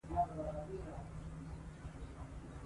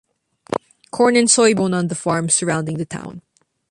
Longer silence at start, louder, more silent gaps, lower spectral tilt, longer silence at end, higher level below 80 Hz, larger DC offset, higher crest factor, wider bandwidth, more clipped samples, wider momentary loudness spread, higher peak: second, 0.05 s vs 0.5 s; second, -46 LUFS vs -17 LUFS; neither; first, -7.5 dB/octave vs -4 dB/octave; second, 0 s vs 0.5 s; first, -52 dBFS vs -58 dBFS; neither; about the same, 20 dB vs 18 dB; about the same, 11.5 kHz vs 11.5 kHz; neither; second, 12 LU vs 16 LU; second, -24 dBFS vs -2 dBFS